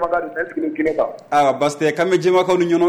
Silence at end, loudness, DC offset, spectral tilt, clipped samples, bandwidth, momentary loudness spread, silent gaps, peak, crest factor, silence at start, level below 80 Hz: 0 s; -18 LUFS; under 0.1%; -5.5 dB/octave; under 0.1%; 12.5 kHz; 7 LU; none; -6 dBFS; 12 dB; 0 s; -54 dBFS